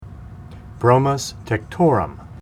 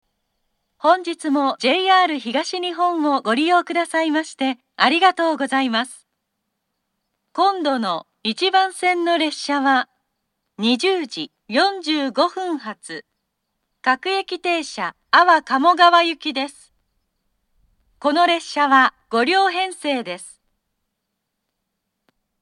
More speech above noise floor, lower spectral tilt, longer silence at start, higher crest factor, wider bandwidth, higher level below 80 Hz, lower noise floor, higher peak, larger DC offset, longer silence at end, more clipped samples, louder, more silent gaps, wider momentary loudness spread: second, 19 dB vs 59 dB; first, -6.5 dB/octave vs -2.5 dB/octave; second, 0 s vs 0.85 s; about the same, 20 dB vs 20 dB; first, 15 kHz vs 12 kHz; first, -42 dBFS vs -72 dBFS; second, -37 dBFS vs -77 dBFS; about the same, 0 dBFS vs 0 dBFS; neither; second, 0 s vs 2.1 s; neither; about the same, -19 LUFS vs -19 LUFS; neither; first, 23 LU vs 12 LU